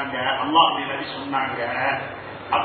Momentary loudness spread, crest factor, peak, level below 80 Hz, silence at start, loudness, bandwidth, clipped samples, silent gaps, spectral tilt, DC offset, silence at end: 11 LU; 20 dB; -4 dBFS; -56 dBFS; 0 s; -22 LUFS; 4.6 kHz; under 0.1%; none; -8.5 dB/octave; under 0.1%; 0 s